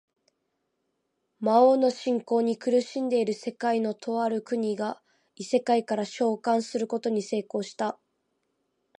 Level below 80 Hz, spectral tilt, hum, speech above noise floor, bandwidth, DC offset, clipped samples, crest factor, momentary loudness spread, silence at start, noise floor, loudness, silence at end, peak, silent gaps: -82 dBFS; -5 dB/octave; none; 52 dB; 10.5 kHz; under 0.1%; under 0.1%; 20 dB; 10 LU; 1.4 s; -78 dBFS; -27 LUFS; 1.05 s; -8 dBFS; none